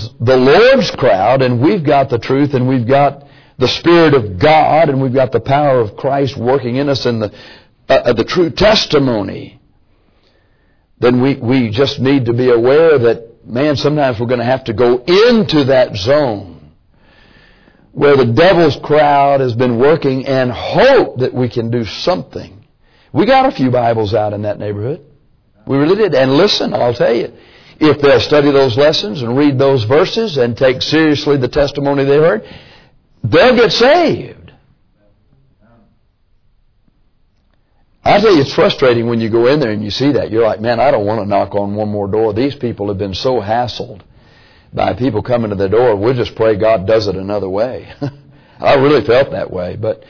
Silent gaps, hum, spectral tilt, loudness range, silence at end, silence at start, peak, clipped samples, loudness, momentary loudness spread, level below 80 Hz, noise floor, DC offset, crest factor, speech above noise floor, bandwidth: none; none; -6.5 dB/octave; 4 LU; 0.1 s; 0 s; 0 dBFS; under 0.1%; -12 LUFS; 10 LU; -42 dBFS; -55 dBFS; 0.4%; 12 dB; 43 dB; 5.4 kHz